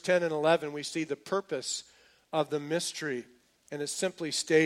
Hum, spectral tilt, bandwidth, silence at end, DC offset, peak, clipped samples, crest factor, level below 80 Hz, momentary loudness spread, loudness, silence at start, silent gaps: none; -3.5 dB/octave; 15.5 kHz; 0 s; under 0.1%; -12 dBFS; under 0.1%; 20 dB; -78 dBFS; 10 LU; -32 LUFS; 0.05 s; none